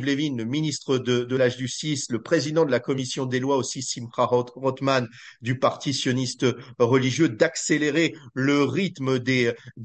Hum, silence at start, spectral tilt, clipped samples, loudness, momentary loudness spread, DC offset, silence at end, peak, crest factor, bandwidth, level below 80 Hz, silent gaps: none; 0 s; -5 dB/octave; under 0.1%; -24 LUFS; 6 LU; under 0.1%; 0 s; -6 dBFS; 18 dB; 9.2 kHz; -66 dBFS; none